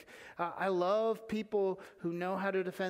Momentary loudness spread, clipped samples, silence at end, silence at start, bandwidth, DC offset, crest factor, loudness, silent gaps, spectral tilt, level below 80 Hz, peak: 9 LU; under 0.1%; 0 s; 0 s; 16 kHz; under 0.1%; 16 dB; -35 LUFS; none; -6.5 dB/octave; -74 dBFS; -20 dBFS